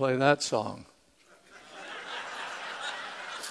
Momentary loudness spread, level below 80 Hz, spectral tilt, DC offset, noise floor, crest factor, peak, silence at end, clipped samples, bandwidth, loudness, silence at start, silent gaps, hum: 21 LU; -74 dBFS; -4 dB/octave; under 0.1%; -61 dBFS; 24 dB; -8 dBFS; 0 s; under 0.1%; 11 kHz; -32 LUFS; 0 s; none; none